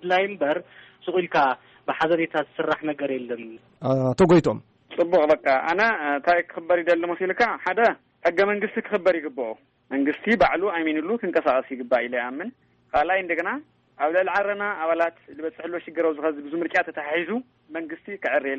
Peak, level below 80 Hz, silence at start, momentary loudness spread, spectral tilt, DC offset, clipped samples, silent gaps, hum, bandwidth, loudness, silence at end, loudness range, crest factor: -10 dBFS; -58 dBFS; 0 s; 13 LU; -6.5 dB/octave; under 0.1%; under 0.1%; none; none; 8.2 kHz; -23 LUFS; 0 s; 4 LU; 14 dB